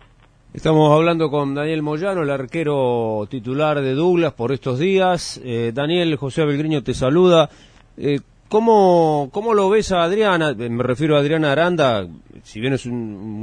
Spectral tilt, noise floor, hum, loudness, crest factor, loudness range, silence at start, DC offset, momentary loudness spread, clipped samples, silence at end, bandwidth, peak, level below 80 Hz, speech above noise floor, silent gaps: -6.5 dB/octave; -51 dBFS; none; -18 LUFS; 16 dB; 3 LU; 0.55 s; under 0.1%; 10 LU; under 0.1%; 0 s; 10.5 kHz; -2 dBFS; -48 dBFS; 33 dB; none